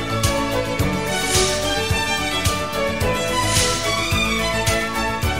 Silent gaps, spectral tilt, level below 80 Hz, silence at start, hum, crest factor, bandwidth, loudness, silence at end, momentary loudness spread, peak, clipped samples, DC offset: none; -3 dB/octave; -32 dBFS; 0 s; none; 16 dB; 16.5 kHz; -19 LUFS; 0 s; 4 LU; -4 dBFS; under 0.1%; 1%